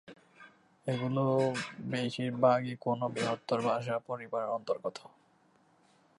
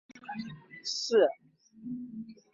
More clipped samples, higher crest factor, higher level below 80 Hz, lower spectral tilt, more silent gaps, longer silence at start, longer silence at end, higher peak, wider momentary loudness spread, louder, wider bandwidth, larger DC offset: neither; about the same, 20 dB vs 20 dB; about the same, -78 dBFS vs -76 dBFS; first, -6.5 dB/octave vs -3.5 dB/octave; neither; about the same, 0.05 s vs 0.15 s; first, 1.2 s vs 0.2 s; about the same, -14 dBFS vs -12 dBFS; second, 9 LU vs 20 LU; about the same, -33 LUFS vs -31 LUFS; first, 11.5 kHz vs 7.8 kHz; neither